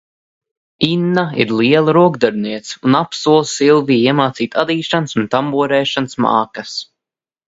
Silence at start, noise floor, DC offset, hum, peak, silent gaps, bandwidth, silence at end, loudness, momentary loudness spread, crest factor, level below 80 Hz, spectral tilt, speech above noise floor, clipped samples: 0.8 s; -87 dBFS; under 0.1%; none; 0 dBFS; none; 8 kHz; 0.65 s; -15 LUFS; 8 LU; 16 dB; -56 dBFS; -5.5 dB/octave; 73 dB; under 0.1%